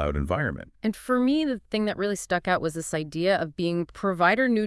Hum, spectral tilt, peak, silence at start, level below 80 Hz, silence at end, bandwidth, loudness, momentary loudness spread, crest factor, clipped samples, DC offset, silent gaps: none; -5.5 dB/octave; -8 dBFS; 0 s; -44 dBFS; 0 s; 12 kHz; -26 LUFS; 9 LU; 18 dB; under 0.1%; under 0.1%; none